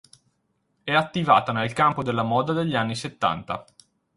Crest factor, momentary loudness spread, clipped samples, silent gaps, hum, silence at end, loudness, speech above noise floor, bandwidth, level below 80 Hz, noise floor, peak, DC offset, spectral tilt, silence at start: 20 dB; 11 LU; under 0.1%; none; none; 0.55 s; -23 LUFS; 49 dB; 11.5 kHz; -58 dBFS; -72 dBFS; -4 dBFS; under 0.1%; -5.5 dB/octave; 0.85 s